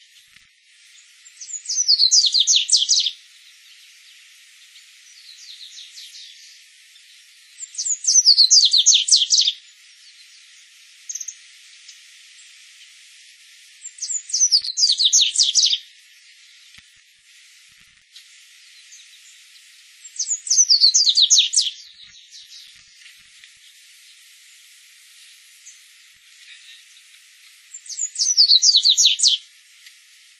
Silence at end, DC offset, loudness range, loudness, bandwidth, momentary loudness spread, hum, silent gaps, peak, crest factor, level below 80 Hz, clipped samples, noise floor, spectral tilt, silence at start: 1 s; under 0.1%; 20 LU; -14 LUFS; 12.5 kHz; 26 LU; none; none; 0 dBFS; 22 dB; -84 dBFS; under 0.1%; -53 dBFS; 9.5 dB/octave; 1.4 s